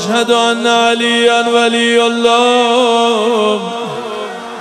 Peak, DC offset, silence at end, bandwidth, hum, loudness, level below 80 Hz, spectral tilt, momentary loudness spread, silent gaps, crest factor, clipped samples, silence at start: 0 dBFS; under 0.1%; 0 s; 13 kHz; none; -11 LUFS; -60 dBFS; -2.5 dB/octave; 11 LU; none; 12 dB; under 0.1%; 0 s